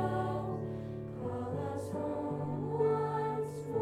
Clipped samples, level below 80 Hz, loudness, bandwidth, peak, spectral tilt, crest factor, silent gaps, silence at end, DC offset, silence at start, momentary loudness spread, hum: under 0.1%; -60 dBFS; -36 LUFS; 13 kHz; -20 dBFS; -8.5 dB/octave; 16 dB; none; 0 s; under 0.1%; 0 s; 8 LU; none